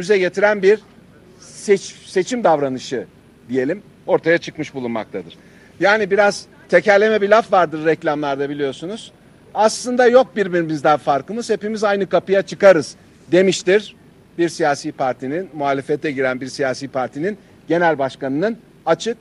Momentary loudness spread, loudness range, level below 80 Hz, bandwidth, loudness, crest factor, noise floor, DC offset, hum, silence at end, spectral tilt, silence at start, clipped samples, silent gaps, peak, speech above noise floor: 13 LU; 5 LU; -60 dBFS; 12 kHz; -18 LUFS; 18 dB; -45 dBFS; under 0.1%; none; 0.05 s; -5 dB/octave; 0 s; under 0.1%; none; 0 dBFS; 28 dB